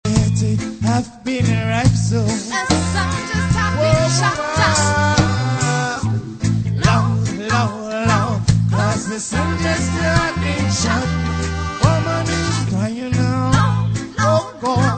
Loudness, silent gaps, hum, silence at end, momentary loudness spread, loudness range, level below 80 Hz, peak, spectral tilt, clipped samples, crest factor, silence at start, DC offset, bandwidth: -18 LUFS; none; none; 0 s; 5 LU; 2 LU; -32 dBFS; 0 dBFS; -5 dB/octave; under 0.1%; 16 dB; 0.05 s; under 0.1%; 9.2 kHz